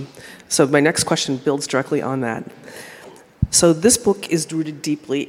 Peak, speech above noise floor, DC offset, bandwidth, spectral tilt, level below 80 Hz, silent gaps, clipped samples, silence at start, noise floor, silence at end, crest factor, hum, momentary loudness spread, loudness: 0 dBFS; 23 dB; under 0.1%; 16.5 kHz; -3.5 dB/octave; -42 dBFS; none; under 0.1%; 0 s; -42 dBFS; 0 s; 20 dB; none; 22 LU; -18 LUFS